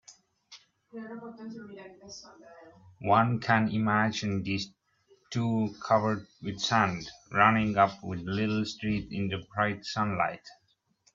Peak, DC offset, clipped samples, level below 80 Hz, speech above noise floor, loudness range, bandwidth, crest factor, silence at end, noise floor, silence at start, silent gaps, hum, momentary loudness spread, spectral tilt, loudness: -6 dBFS; under 0.1%; under 0.1%; -62 dBFS; 40 dB; 5 LU; 7.6 kHz; 24 dB; 0.6 s; -69 dBFS; 0.1 s; none; none; 20 LU; -5.5 dB/octave; -28 LUFS